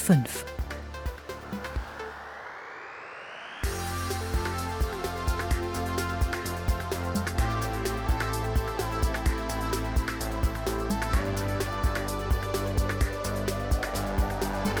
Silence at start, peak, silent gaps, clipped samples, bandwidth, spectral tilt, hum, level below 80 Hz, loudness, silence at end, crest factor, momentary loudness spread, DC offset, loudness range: 0 s; -10 dBFS; none; under 0.1%; over 20 kHz; -5 dB/octave; none; -32 dBFS; -30 LUFS; 0 s; 18 dB; 10 LU; under 0.1%; 6 LU